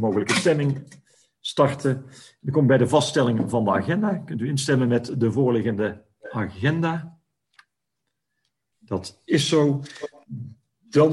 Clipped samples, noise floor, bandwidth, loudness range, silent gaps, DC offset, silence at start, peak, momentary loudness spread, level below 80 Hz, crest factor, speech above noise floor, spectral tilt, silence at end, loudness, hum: under 0.1%; -81 dBFS; 12 kHz; 7 LU; none; under 0.1%; 0 s; -6 dBFS; 16 LU; -62 dBFS; 18 dB; 59 dB; -6 dB/octave; 0 s; -23 LUFS; none